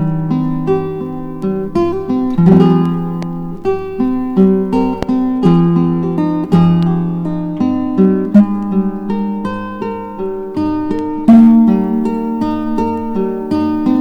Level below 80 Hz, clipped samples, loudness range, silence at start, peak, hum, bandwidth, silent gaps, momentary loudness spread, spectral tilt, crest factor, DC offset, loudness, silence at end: -38 dBFS; under 0.1%; 3 LU; 0 s; 0 dBFS; none; 6 kHz; none; 12 LU; -10 dB/octave; 12 dB; under 0.1%; -14 LUFS; 0 s